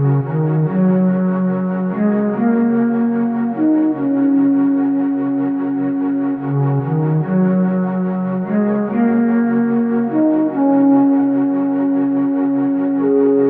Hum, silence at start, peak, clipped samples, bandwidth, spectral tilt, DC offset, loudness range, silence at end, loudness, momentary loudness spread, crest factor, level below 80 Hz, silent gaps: none; 0 s; -4 dBFS; under 0.1%; 3.2 kHz; -13 dB/octave; under 0.1%; 2 LU; 0 s; -16 LUFS; 5 LU; 12 dB; -60 dBFS; none